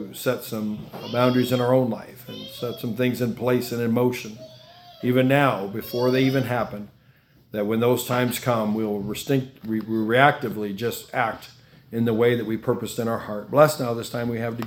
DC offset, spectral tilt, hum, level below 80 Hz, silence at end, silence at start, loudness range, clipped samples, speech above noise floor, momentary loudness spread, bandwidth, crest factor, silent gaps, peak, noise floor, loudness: under 0.1%; -6 dB/octave; none; -60 dBFS; 0 s; 0 s; 2 LU; under 0.1%; 33 dB; 13 LU; 18 kHz; 24 dB; none; 0 dBFS; -56 dBFS; -23 LUFS